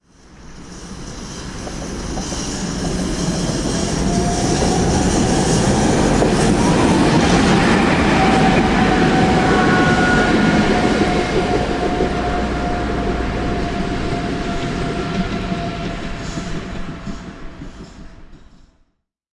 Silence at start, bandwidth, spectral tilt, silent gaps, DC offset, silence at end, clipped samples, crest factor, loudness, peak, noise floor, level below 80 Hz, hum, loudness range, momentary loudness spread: 0.3 s; 11.5 kHz; -5 dB/octave; none; under 0.1%; 0.95 s; under 0.1%; 14 dB; -17 LUFS; -2 dBFS; -65 dBFS; -28 dBFS; none; 12 LU; 16 LU